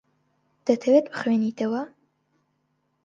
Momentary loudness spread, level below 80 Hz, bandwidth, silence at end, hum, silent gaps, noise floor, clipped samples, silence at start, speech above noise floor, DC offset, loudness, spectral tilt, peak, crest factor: 11 LU; -76 dBFS; 7.6 kHz; 1.2 s; none; none; -72 dBFS; under 0.1%; 0.65 s; 50 dB; under 0.1%; -24 LUFS; -6.5 dB/octave; -6 dBFS; 20 dB